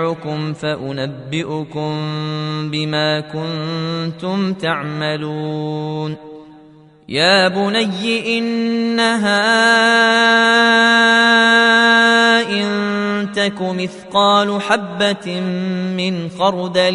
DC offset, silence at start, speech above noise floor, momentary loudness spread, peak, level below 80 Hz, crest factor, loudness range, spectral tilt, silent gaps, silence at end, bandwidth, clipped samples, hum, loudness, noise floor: under 0.1%; 0 s; 28 dB; 13 LU; 0 dBFS; -60 dBFS; 16 dB; 10 LU; -4.5 dB/octave; none; 0 s; 11 kHz; under 0.1%; none; -15 LUFS; -44 dBFS